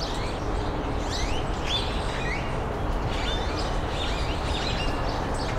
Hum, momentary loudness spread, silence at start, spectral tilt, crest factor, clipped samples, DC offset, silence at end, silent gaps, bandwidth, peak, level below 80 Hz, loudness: none; 3 LU; 0 s; -5 dB/octave; 12 dB; under 0.1%; under 0.1%; 0 s; none; 13.5 kHz; -14 dBFS; -30 dBFS; -28 LUFS